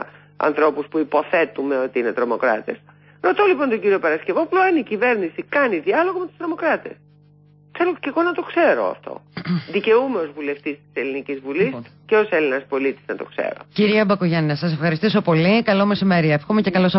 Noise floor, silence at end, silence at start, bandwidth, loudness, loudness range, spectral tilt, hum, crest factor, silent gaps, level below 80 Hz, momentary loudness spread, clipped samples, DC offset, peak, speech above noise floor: -51 dBFS; 0 s; 0 s; 5.8 kHz; -20 LUFS; 4 LU; -11 dB/octave; 50 Hz at -50 dBFS; 14 dB; none; -62 dBFS; 10 LU; under 0.1%; under 0.1%; -6 dBFS; 32 dB